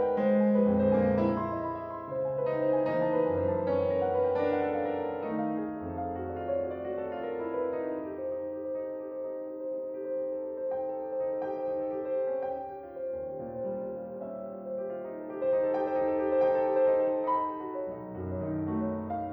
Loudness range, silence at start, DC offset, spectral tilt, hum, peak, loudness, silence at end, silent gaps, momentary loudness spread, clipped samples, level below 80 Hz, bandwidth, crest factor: 7 LU; 0 s; under 0.1%; -10.5 dB/octave; none; -16 dBFS; -31 LUFS; 0 s; none; 12 LU; under 0.1%; -62 dBFS; 5 kHz; 14 dB